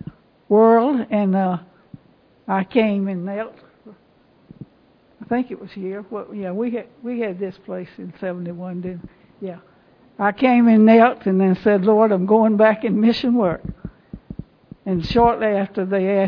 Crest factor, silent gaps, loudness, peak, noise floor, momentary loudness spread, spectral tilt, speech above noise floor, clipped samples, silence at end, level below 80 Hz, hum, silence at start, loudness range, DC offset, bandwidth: 18 dB; none; -18 LUFS; -2 dBFS; -55 dBFS; 21 LU; -9 dB/octave; 37 dB; under 0.1%; 0 s; -48 dBFS; none; 0.5 s; 14 LU; under 0.1%; 5.4 kHz